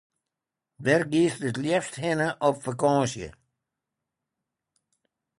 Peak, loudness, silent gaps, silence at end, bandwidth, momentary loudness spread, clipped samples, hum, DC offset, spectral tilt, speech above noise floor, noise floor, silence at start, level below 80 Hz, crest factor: -8 dBFS; -25 LUFS; none; 2.1 s; 11.5 kHz; 8 LU; under 0.1%; none; under 0.1%; -5.5 dB/octave; 62 dB; -87 dBFS; 0.8 s; -62 dBFS; 20 dB